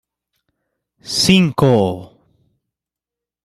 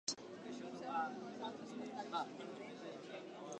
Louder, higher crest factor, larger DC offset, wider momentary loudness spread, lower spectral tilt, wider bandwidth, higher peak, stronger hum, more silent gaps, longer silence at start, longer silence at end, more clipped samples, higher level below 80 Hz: first, -14 LUFS vs -47 LUFS; about the same, 18 dB vs 22 dB; neither; about the same, 10 LU vs 8 LU; first, -5 dB/octave vs -3 dB/octave; first, 14 kHz vs 11 kHz; first, -2 dBFS vs -26 dBFS; neither; neither; first, 1.05 s vs 0.05 s; first, 1.4 s vs 0 s; neither; first, -50 dBFS vs -88 dBFS